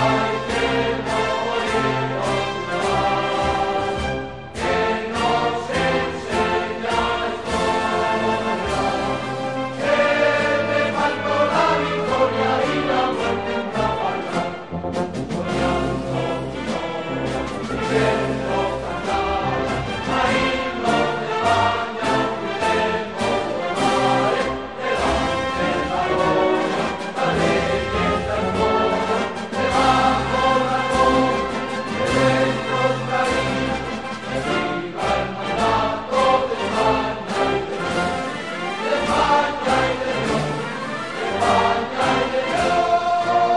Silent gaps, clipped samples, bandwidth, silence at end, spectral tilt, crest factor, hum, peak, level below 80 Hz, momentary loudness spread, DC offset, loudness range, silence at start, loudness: none; under 0.1%; 11 kHz; 0 s; -5 dB/octave; 16 dB; none; -4 dBFS; -40 dBFS; 7 LU; 0.4%; 4 LU; 0 s; -21 LUFS